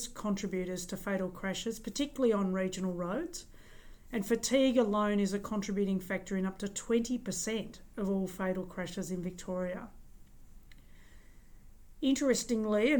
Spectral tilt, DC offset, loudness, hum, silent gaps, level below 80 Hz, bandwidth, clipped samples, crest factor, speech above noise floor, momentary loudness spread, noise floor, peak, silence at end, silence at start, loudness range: -5 dB/octave; under 0.1%; -33 LUFS; none; none; -54 dBFS; 19.5 kHz; under 0.1%; 18 dB; 21 dB; 10 LU; -54 dBFS; -16 dBFS; 0 s; 0 s; 8 LU